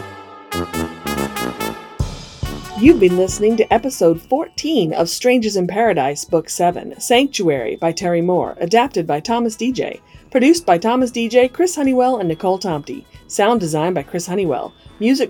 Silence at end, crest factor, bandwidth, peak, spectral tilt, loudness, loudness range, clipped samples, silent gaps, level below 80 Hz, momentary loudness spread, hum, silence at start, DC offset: 0 s; 16 dB; 20 kHz; 0 dBFS; -5 dB/octave; -17 LUFS; 3 LU; under 0.1%; none; -42 dBFS; 12 LU; none; 0 s; under 0.1%